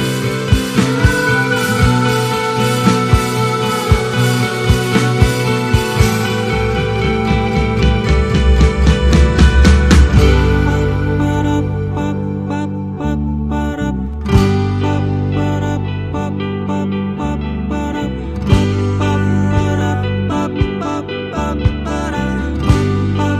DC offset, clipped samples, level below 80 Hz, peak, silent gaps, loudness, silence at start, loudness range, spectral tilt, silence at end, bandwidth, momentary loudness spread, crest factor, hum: under 0.1%; under 0.1%; -20 dBFS; 0 dBFS; none; -15 LUFS; 0 s; 6 LU; -6 dB/octave; 0 s; 15 kHz; 8 LU; 14 dB; none